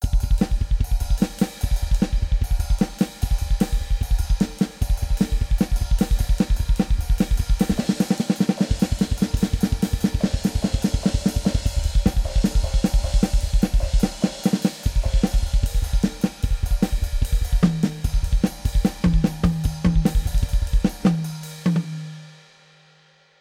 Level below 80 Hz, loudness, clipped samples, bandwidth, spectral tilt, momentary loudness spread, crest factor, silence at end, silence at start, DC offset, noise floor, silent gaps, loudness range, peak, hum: -22 dBFS; -23 LUFS; under 0.1%; 16 kHz; -6.5 dB/octave; 4 LU; 16 dB; 1.1 s; 0 s; under 0.1%; -56 dBFS; none; 2 LU; -4 dBFS; none